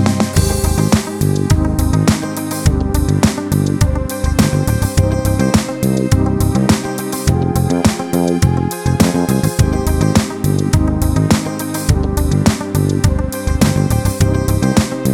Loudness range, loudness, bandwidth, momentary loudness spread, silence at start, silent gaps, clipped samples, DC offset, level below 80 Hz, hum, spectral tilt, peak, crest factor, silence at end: 1 LU; -15 LUFS; 19 kHz; 3 LU; 0 s; none; under 0.1%; under 0.1%; -22 dBFS; none; -6 dB/octave; 0 dBFS; 14 dB; 0 s